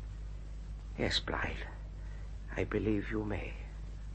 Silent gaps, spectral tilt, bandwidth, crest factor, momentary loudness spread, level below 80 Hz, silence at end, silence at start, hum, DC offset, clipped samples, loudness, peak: none; -5.5 dB/octave; 8.4 kHz; 18 dB; 14 LU; -42 dBFS; 0 s; 0 s; 50 Hz at -45 dBFS; under 0.1%; under 0.1%; -38 LUFS; -20 dBFS